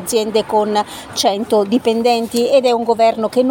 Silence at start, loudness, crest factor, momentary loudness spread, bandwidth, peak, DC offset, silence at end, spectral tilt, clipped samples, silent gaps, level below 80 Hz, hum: 0 s; -15 LUFS; 12 dB; 4 LU; 17 kHz; -2 dBFS; under 0.1%; 0 s; -4 dB/octave; under 0.1%; none; -54 dBFS; none